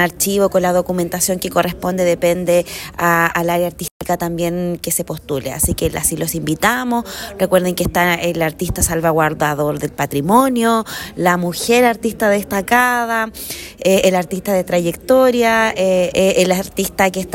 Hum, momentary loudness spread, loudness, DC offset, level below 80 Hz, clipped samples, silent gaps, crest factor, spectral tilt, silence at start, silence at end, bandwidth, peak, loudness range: none; 8 LU; -16 LUFS; under 0.1%; -38 dBFS; under 0.1%; 3.91-4.00 s; 16 dB; -4 dB/octave; 0 s; 0 s; 16.5 kHz; 0 dBFS; 3 LU